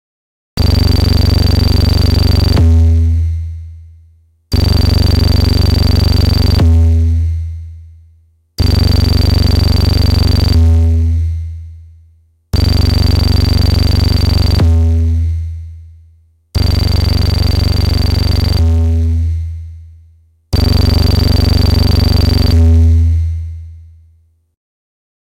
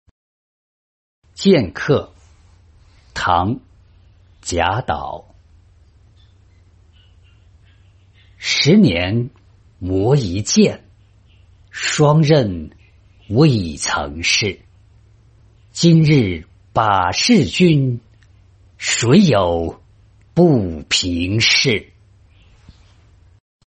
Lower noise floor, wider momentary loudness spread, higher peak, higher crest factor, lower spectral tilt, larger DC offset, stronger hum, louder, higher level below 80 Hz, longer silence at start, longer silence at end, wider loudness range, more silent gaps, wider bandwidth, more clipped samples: about the same, -50 dBFS vs -50 dBFS; second, 12 LU vs 17 LU; about the same, -4 dBFS vs -2 dBFS; second, 8 dB vs 16 dB; first, -6.5 dB/octave vs -5 dB/octave; neither; neither; first, -12 LUFS vs -16 LUFS; first, -14 dBFS vs -46 dBFS; second, 0.55 s vs 1.4 s; second, 1.5 s vs 1.85 s; second, 3 LU vs 7 LU; neither; first, 16 kHz vs 8.8 kHz; neither